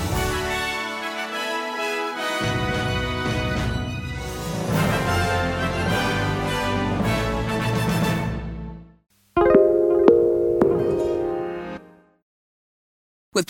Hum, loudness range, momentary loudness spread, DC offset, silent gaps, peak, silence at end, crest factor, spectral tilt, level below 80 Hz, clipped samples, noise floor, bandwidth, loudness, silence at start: none; 5 LU; 12 LU; under 0.1%; 12.22-13.32 s; 0 dBFS; 0.05 s; 22 dB; -5.5 dB/octave; -38 dBFS; under 0.1%; under -90 dBFS; 17 kHz; -22 LUFS; 0 s